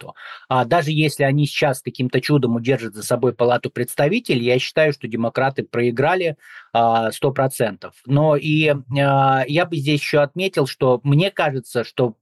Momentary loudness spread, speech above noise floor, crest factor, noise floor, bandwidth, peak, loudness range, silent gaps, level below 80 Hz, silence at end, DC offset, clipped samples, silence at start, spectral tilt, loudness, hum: 7 LU; 19 dB; 12 dB; -38 dBFS; 12.5 kHz; -6 dBFS; 2 LU; none; -60 dBFS; 0.1 s; under 0.1%; under 0.1%; 0 s; -6 dB/octave; -19 LUFS; none